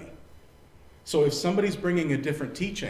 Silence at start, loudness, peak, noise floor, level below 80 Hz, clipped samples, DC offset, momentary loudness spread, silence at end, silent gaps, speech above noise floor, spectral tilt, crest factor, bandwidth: 0 s; -27 LUFS; -12 dBFS; -52 dBFS; -54 dBFS; under 0.1%; under 0.1%; 10 LU; 0 s; none; 26 dB; -5.5 dB/octave; 16 dB; 16 kHz